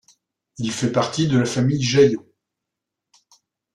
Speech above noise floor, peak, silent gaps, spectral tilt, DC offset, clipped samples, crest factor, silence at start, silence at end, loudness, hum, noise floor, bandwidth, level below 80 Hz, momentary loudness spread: 65 dB; -4 dBFS; none; -5.5 dB/octave; under 0.1%; under 0.1%; 18 dB; 0.6 s; 1.55 s; -20 LUFS; none; -83 dBFS; 11.5 kHz; -56 dBFS; 12 LU